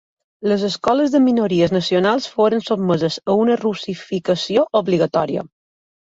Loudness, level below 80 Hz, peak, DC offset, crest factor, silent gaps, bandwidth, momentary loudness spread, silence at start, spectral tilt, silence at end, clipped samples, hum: -18 LUFS; -58 dBFS; -4 dBFS; under 0.1%; 14 dB; none; 8 kHz; 8 LU; 0.4 s; -6 dB/octave; 0.65 s; under 0.1%; none